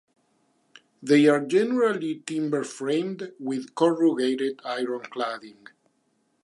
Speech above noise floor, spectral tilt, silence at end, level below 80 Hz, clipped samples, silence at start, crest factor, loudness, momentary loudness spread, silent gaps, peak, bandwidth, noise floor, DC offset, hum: 46 dB; -5.5 dB/octave; 0.9 s; -84 dBFS; under 0.1%; 1 s; 20 dB; -25 LUFS; 12 LU; none; -6 dBFS; 11.5 kHz; -70 dBFS; under 0.1%; none